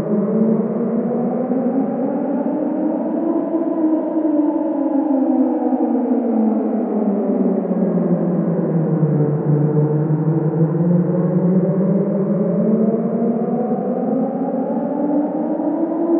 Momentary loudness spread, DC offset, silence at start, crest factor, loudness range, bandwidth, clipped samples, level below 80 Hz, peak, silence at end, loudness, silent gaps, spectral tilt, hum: 4 LU; under 0.1%; 0 s; 14 dB; 2 LU; 2.9 kHz; under 0.1%; -66 dBFS; -4 dBFS; 0 s; -18 LUFS; none; -15 dB/octave; none